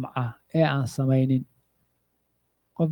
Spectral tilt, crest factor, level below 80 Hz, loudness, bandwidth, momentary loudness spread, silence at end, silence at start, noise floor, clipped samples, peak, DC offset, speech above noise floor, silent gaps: -7.5 dB/octave; 18 dB; -64 dBFS; -25 LUFS; 12 kHz; 14 LU; 0 s; 0 s; -73 dBFS; under 0.1%; -8 dBFS; under 0.1%; 49 dB; none